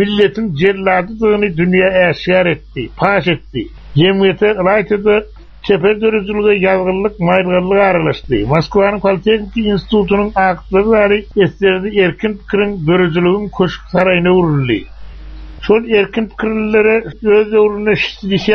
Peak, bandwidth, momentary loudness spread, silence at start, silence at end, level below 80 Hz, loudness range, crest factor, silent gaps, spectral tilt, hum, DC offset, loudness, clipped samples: 0 dBFS; 6.4 kHz; 6 LU; 0 s; 0 s; -36 dBFS; 1 LU; 12 dB; none; -4.5 dB/octave; none; under 0.1%; -13 LUFS; under 0.1%